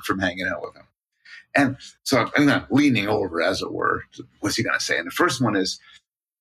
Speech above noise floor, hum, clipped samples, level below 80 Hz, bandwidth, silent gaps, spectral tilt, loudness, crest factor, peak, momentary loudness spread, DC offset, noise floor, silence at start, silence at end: 27 dB; none; under 0.1%; -56 dBFS; 14 kHz; none; -4.5 dB/octave; -22 LUFS; 20 dB; -4 dBFS; 11 LU; under 0.1%; -49 dBFS; 0 s; 0.65 s